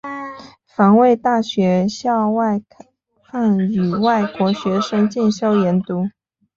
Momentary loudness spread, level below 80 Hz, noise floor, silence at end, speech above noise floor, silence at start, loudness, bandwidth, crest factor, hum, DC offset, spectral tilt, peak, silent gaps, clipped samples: 12 LU; -58 dBFS; -37 dBFS; 0.5 s; 21 dB; 0.05 s; -17 LUFS; 7.4 kHz; 14 dB; none; under 0.1%; -7 dB/octave; -4 dBFS; none; under 0.1%